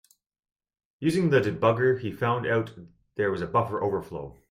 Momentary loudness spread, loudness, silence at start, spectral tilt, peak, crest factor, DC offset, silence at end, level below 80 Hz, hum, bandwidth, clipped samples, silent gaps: 14 LU; -26 LUFS; 1 s; -7 dB/octave; -8 dBFS; 20 dB; under 0.1%; 0.2 s; -60 dBFS; none; 15 kHz; under 0.1%; none